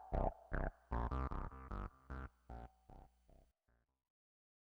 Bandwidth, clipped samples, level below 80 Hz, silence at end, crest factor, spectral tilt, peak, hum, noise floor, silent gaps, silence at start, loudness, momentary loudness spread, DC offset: 5.6 kHz; under 0.1%; -48 dBFS; 1.55 s; 24 dB; -9 dB/octave; -22 dBFS; none; -82 dBFS; none; 0 s; -47 LUFS; 18 LU; under 0.1%